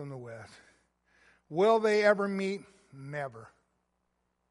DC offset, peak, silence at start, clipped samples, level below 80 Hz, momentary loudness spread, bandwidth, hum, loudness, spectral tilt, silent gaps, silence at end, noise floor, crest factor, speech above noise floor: under 0.1%; -10 dBFS; 0 s; under 0.1%; -78 dBFS; 21 LU; 11.5 kHz; none; -28 LUFS; -5.5 dB/octave; none; 1.05 s; -79 dBFS; 22 dB; 50 dB